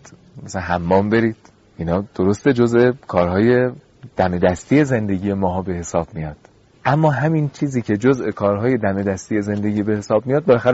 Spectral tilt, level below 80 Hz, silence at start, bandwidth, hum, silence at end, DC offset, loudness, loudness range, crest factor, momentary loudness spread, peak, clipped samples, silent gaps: -7 dB/octave; -46 dBFS; 0.1 s; 8 kHz; none; 0 s; under 0.1%; -18 LUFS; 3 LU; 16 dB; 8 LU; -2 dBFS; under 0.1%; none